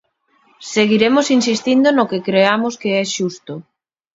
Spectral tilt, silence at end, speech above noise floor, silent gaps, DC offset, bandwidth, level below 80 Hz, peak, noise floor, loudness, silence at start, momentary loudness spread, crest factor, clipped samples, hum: -4 dB/octave; 0.55 s; 43 dB; none; under 0.1%; 7.8 kHz; -62 dBFS; 0 dBFS; -58 dBFS; -15 LUFS; 0.6 s; 17 LU; 16 dB; under 0.1%; none